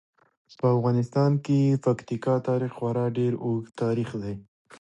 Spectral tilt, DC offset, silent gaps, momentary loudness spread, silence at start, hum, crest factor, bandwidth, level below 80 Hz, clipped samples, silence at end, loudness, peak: -9 dB/octave; under 0.1%; none; 7 LU; 0.65 s; none; 16 dB; 8.8 kHz; -62 dBFS; under 0.1%; 0.4 s; -26 LUFS; -10 dBFS